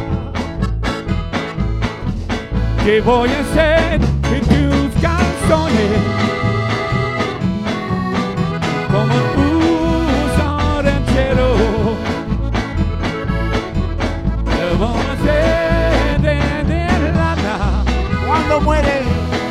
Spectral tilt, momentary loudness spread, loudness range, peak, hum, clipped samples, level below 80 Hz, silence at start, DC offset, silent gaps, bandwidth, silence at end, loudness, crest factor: -6.5 dB/octave; 7 LU; 3 LU; 0 dBFS; none; under 0.1%; -22 dBFS; 0 s; under 0.1%; none; 13 kHz; 0 s; -16 LUFS; 16 dB